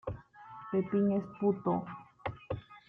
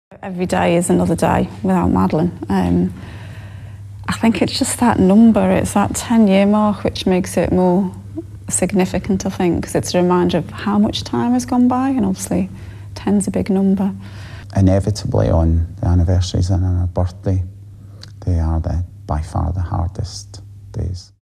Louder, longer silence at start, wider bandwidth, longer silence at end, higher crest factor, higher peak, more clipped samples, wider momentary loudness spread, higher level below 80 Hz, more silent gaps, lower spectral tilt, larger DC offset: second, -34 LUFS vs -17 LUFS; about the same, 0.05 s vs 0.1 s; second, 3.9 kHz vs 13.5 kHz; about the same, 0.1 s vs 0.2 s; about the same, 18 dB vs 14 dB; second, -18 dBFS vs -2 dBFS; neither; about the same, 18 LU vs 16 LU; second, -60 dBFS vs -32 dBFS; neither; first, -10.5 dB/octave vs -6.5 dB/octave; neither